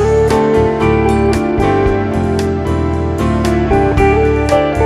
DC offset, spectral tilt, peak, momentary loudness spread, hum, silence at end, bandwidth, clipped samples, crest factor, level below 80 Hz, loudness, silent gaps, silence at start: under 0.1%; -7 dB/octave; 0 dBFS; 5 LU; none; 0 s; 13.5 kHz; under 0.1%; 12 dB; -22 dBFS; -13 LUFS; none; 0 s